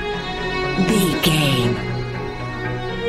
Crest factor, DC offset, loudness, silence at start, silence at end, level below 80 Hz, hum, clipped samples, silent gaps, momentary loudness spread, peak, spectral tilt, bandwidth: 16 dB; under 0.1%; -20 LUFS; 0 s; 0 s; -36 dBFS; none; under 0.1%; none; 10 LU; -4 dBFS; -5 dB/octave; 16 kHz